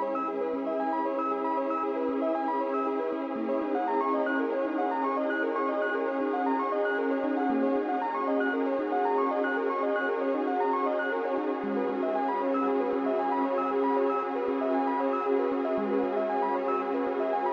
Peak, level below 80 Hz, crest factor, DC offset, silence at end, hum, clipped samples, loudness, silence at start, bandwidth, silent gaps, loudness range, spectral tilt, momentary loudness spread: -14 dBFS; -76 dBFS; 14 dB; under 0.1%; 0 s; none; under 0.1%; -29 LUFS; 0 s; 6.2 kHz; none; 1 LU; -7 dB/octave; 3 LU